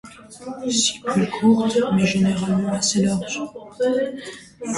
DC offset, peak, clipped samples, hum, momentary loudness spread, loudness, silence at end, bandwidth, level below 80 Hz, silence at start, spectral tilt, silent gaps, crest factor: under 0.1%; -4 dBFS; under 0.1%; none; 16 LU; -20 LUFS; 0 s; 11.5 kHz; -56 dBFS; 0.05 s; -4.5 dB/octave; none; 16 dB